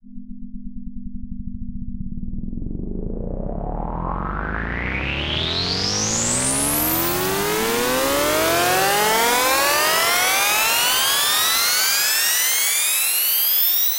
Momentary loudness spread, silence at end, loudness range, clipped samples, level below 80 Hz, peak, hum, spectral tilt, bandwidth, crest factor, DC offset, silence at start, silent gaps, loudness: 18 LU; 0 s; 15 LU; under 0.1%; -34 dBFS; -6 dBFS; none; -1.5 dB/octave; 16 kHz; 16 dB; under 0.1%; 0.05 s; none; -17 LUFS